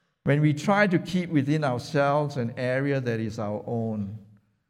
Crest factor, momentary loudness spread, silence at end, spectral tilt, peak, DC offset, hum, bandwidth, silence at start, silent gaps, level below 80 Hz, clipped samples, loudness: 16 dB; 9 LU; 0.45 s; -7 dB/octave; -10 dBFS; under 0.1%; none; 12 kHz; 0.25 s; none; -64 dBFS; under 0.1%; -26 LUFS